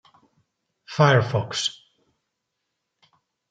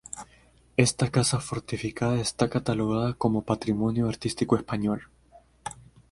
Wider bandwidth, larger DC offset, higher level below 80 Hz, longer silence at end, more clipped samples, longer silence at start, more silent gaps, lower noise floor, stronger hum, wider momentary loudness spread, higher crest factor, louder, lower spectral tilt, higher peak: second, 9.2 kHz vs 11.5 kHz; neither; second, -66 dBFS vs -52 dBFS; first, 1.8 s vs 0.3 s; neither; first, 0.9 s vs 0.15 s; neither; first, -80 dBFS vs -58 dBFS; neither; second, 10 LU vs 16 LU; about the same, 24 dB vs 24 dB; first, -22 LUFS vs -27 LUFS; about the same, -5 dB/octave vs -5.5 dB/octave; about the same, -4 dBFS vs -2 dBFS